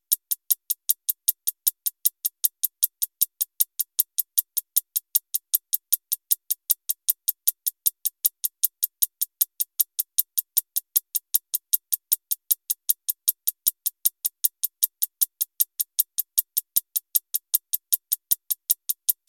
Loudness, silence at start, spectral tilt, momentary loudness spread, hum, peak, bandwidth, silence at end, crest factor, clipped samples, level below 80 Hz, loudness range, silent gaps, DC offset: -23 LUFS; 0.1 s; 7.5 dB/octave; 1 LU; none; -2 dBFS; 19.5 kHz; 0.15 s; 24 dB; under 0.1%; under -90 dBFS; 0 LU; none; under 0.1%